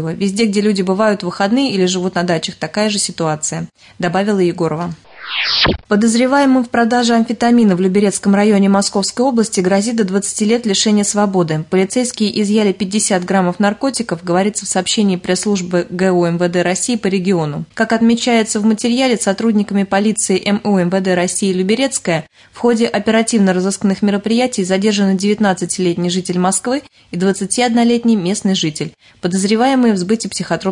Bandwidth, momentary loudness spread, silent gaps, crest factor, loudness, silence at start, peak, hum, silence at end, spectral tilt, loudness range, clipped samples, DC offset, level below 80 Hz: 11 kHz; 6 LU; none; 12 dB; -15 LUFS; 0 s; -2 dBFS; none; 0 s; -4.5 dB/octave; 3 LU; under 0.1%; under 0.1%; -48 dBFS